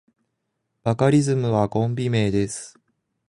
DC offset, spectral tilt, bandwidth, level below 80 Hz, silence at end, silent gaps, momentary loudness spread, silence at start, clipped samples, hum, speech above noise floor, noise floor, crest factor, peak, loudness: under 0.1%; -6.5 dB/octave; 11 kHz; -50 dBFS; 0.6 s; none; 11 LU; 0.85 s; under 0.1%; none; 56 dB; -77 dBFS; 16 dB; -6 dBFS; -22 LUFS